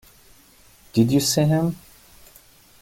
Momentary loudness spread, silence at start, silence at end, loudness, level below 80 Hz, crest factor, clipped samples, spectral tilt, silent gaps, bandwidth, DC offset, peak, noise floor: 9 LU; 0.95 s; 1.05 s; -20 LUFS; -54 dBFS; 18 dB; under 0.1%; -5.5 dB/octave; none; 17 kHz; under 0.1%; -6 dBFS; -52 dBFS